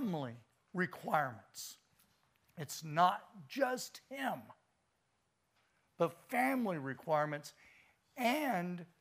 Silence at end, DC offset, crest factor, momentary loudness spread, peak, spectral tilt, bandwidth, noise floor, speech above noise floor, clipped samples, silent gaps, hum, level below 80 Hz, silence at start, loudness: 0.15 s; under 0.1%; 22 dB; 15 LU; -16 dBFS; -5 dB/octave; 15.5 kHz; -80 dBFS; 43 dB; under 0.1%; none; none; -86 dBFS; 0 s; -38 LUFS